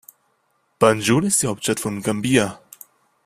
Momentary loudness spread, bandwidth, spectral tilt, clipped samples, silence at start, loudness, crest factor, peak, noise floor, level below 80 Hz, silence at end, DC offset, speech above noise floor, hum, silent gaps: 7 LU; 16 kHz; -4 dB/octave; under 0.1%; 0.8 s; -19 LUFS; 20 dB; -2 dBFS; -67 dBFS; -54 dBFS; 0.7 s; under 0.1%; 48 dB; none; none